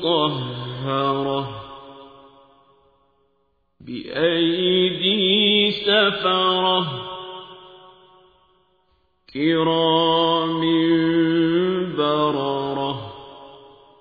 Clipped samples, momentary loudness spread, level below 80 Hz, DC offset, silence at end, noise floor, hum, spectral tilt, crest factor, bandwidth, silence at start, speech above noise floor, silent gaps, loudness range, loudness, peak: under 0.1%; 18 LU; -58 dBFS; under 0.1%; 0.45 s; -68 dBFS; none; -8 dB/octave; 16 dB; 5 kHz; 0 s; 49 dB; none; 10 LU; -19 LUFS; -6 dBFS